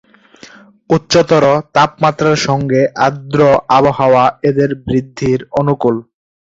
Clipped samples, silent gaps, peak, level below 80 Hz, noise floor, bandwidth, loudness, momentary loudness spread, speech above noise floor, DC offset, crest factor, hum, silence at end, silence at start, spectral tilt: under 0.1%; none; 0 dBFS; -46 dBFS; -41 dBFS; 7.8 kHz; -13 LUFS; 6 LU; 29 dB; under 0.1%; 12 dB; none; 0.5 s; 0.9 s; -6 dB/octave